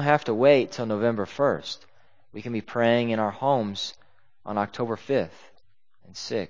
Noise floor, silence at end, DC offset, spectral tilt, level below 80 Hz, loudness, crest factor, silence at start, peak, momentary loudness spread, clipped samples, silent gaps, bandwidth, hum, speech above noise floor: -67 dBFS; 0.05 s; 0.3%; -6 dB/octave; -64 dBFS; -25 LUFS; 22 dB; 0 s; -4 dBFS; 17 LU; under 0.1%; none; 7.6 kHz; none; 43 dB